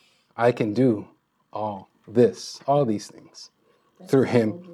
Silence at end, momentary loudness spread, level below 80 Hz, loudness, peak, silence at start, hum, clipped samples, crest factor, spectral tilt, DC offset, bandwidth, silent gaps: 0 s; 21 LU; -76 dBFS; -23 LUFS; -6 dBFS; 0.4 s; none; under 0.1%; 20 dB; -7 dB/octave; under 0.1%; 13 kHz; none